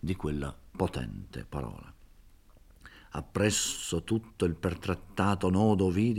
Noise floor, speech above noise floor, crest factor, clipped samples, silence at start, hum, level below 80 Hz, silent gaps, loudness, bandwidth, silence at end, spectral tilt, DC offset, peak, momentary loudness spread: -57 dBFS; 26 dB; 20 dB; under 0.1%; 0.05 s; none; -50 dBFS; none; -31 LUFS; 16.5 kHz; 0 s; -5 dB/octave; under 0.1%; -10 dBFS; 15 LU